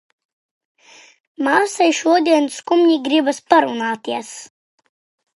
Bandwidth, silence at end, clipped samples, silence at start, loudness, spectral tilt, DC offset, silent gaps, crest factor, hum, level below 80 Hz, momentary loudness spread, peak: 11.5 kHz; 0.9 s; under 0.1%; 1.4 s; -17 LUFS; -2.5 dB/octave; under 0.1%; none; 18 dB; none; -76 dBFS; 11 LU; 0 dBFS